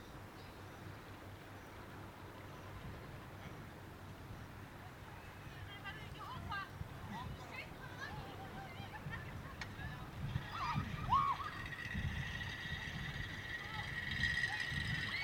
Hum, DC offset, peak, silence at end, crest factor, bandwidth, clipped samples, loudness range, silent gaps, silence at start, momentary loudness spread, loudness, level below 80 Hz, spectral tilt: none; under 0.1%; -24 dBFS; 0 s; 22 dB; over 20 kHz; under 0.1%; 11 LU; none; 0 s; 16 LU; -44 LUFS; -56 dBFS; -4.5 dB/octave